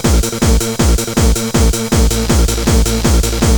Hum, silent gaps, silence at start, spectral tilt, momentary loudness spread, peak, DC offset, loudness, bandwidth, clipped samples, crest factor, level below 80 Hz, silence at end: none; none; 0 s; -4.5 dB/octave; 1 LU; 0 dBFS; under 0.1%; -13 LUFS; over 20 kHz; under 0.1%; 10 dB; -14 dBFS; 0 s